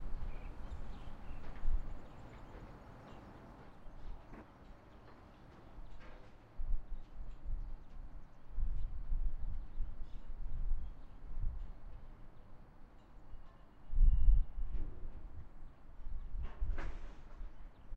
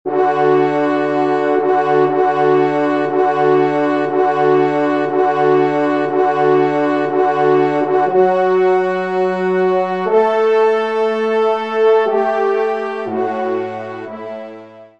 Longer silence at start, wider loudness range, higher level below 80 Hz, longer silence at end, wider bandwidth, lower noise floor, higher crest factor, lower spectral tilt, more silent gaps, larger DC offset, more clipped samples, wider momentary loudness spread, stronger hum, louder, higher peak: about the same, 0 s vs 0.05 s; first, 15 LU vs 2 LU; first, -38 dBFS vs -68 dBFS; second, 0 s vs 0.15 s; second, 3.3 kHz vs 7.4 kHz; first, -57 dBFS vs -36 dBFS; first, 22 dB vs 12 dB; about the same, -8 dB/octave vs -7.5 dB/octave; neither; second, under 0.1% vs 0.3%; neither; first, 15 LU vs 6 LU; neither; second, -46 LUFS vs -15 LUFS; second, -14 dBFS vs -2 dBFS